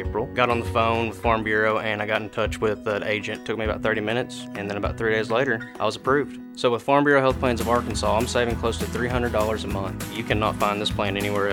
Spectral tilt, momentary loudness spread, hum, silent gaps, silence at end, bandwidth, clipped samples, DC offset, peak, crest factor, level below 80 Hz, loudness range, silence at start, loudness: -5 dB/octave; 7 LU; none; none; 0 s; 19 kHz; under 0.1%; under 0.1%; -4 dBFS; 20 dB; -40 dBFS; 3 LU; 0 s; -24 LUFS